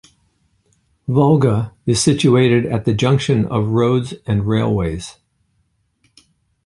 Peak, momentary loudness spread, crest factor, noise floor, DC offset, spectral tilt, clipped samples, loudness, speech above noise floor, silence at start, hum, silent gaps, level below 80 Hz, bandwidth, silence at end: -2 dBFS; 8 LU; 16 dB; -65 dBFS; under 0.1%; -6 dB/octave; under 0.1%; -16 LUFS; 49 dB; 1.1 s; none; none; -42 dBFS; 11.5 kHz; 1.55 s